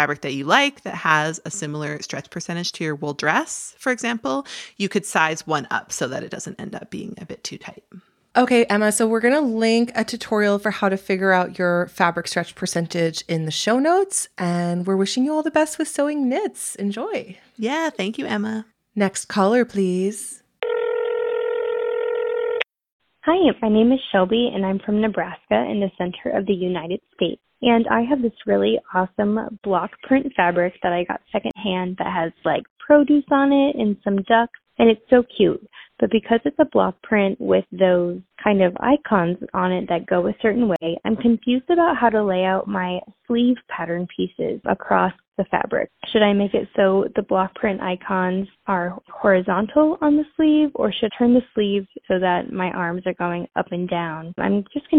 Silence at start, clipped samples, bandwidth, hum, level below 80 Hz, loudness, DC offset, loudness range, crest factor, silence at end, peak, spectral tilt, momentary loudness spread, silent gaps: 0 s; under 0.1%; 15 kHz; none; -56 dBFS; -21 LUFS; under 0.1%; 5 LU; 18 dB; 0 s; -2 dBFS; -5 dB/octave; 10 LU; 22.92-23.00 s, 32.70-32.76 s, 45.28-45.32 s